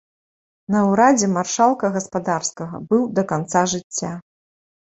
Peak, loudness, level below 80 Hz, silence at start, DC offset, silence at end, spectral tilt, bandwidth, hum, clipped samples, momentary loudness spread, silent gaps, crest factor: -2 dBFS; -19 LUFS; -60 dBFS; 0.7 s; under 0.1%; 0.7 s; -4.5 dB/octave; 8.2 kHz; none; under 0.1%; 12 LU; 3.84-3.90 s; 18 dB